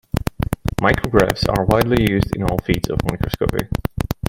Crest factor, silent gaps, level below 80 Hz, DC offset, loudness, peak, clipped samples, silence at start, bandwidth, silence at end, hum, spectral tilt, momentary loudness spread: 18 dB; none; -30 dBFS; under 0.1%; -19 LUFS; 0 dBFS; under 0.1%; 0.15 s; 17 kHz; 0 s; none; -6.5 dB/octave; 8 LU